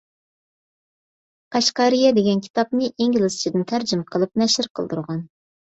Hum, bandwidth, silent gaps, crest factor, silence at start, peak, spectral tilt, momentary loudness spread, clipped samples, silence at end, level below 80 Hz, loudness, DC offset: none; 8.2 kHz; 2.50-2.54 s, 4.70-4.75 s; 16 dB; 1.5 s; -4 dBFS; -4.5 dB/octave; 10 LU; under 0.1%; 0.35 s; -64 dBFS; -20 LUFS; under 0.1%